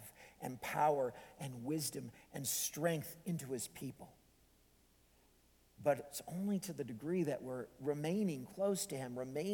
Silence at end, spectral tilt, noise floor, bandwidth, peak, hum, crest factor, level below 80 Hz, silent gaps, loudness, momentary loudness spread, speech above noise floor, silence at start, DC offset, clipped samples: 0 s; -4.5 dB/octave; -70 dBFS; 19 kHz; -22 dBFS; none; 20 dB; -74 dBFS; none; -40 LUFS; 13 LU; 30 dB; 0 s; under 0.1%; under 0.1%